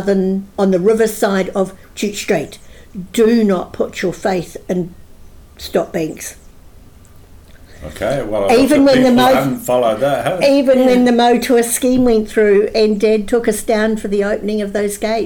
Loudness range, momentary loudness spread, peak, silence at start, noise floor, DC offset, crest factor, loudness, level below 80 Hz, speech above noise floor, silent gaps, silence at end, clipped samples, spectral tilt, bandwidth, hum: 11 LU; 12 LU; -2 dBFS; 0 s; -40 dBFS; under 0.1%; 12 dB; -14 LUFS; -40 dBFS; 26 dB; none; 0 s; under 0.1%; -5 dB/octave; 19 kHz; none